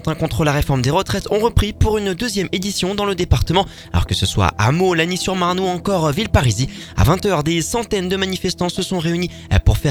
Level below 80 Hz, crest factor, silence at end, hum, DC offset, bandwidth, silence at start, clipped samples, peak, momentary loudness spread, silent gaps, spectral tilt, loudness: -28 dBFS; 18 dB; 0 s; none; under 0.1%; 19 kHz; 0 s; under 0.1%; 0 dBFS; 5 LU; none; -5 dB/octave; -18 LUFS